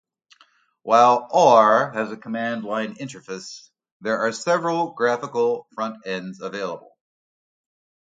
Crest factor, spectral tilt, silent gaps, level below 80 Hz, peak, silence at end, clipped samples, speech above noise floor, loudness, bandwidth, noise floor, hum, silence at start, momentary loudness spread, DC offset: 20 dB; -4.5 dB/octave; 3.92-4.00 s; -74 dBFS; -2 dBFS; 1.25 s; under 0.1%; 38 dB; -21 LUFS; 9.2 kHz; -59 dBFS; none; 0.85 s; 19 LU; under 0.1%